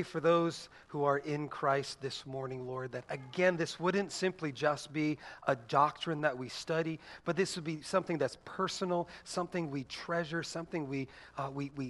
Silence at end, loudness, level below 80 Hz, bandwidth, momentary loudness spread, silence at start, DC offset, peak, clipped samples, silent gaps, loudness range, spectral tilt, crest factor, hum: 0 s; -35 LUFS; -70 dBFS; 11.5 kHz; 10 LU; 0 s; under 0.1%; -14 dBFS; under 0.1%; none; 3 LU; -5 dB/octave; 22 dB; none